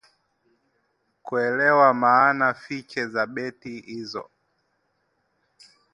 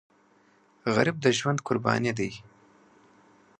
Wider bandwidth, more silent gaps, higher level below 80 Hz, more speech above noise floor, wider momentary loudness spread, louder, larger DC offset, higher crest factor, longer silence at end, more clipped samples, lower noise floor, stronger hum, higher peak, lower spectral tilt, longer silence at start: first, 11 kHz vs 9.8 kHz; neither; second, -74 dBFS vs -64 dBFS; first, 49 dB vs 36 dB; first, 18 LU vs 11 LU; first, -21 LUFS vs -27 LUFS; neither; about the same, 22 dB vs 24 dB; first, 1.7 s vs 1.2 s; neither; first, -72 dBFS vs -62 dBFS; neither; about the same, -4 dBFS vs -6 dBFS; about the same, -6 dB/octave vs -5 dB/octave; first, 1.25 s vs 0.85 s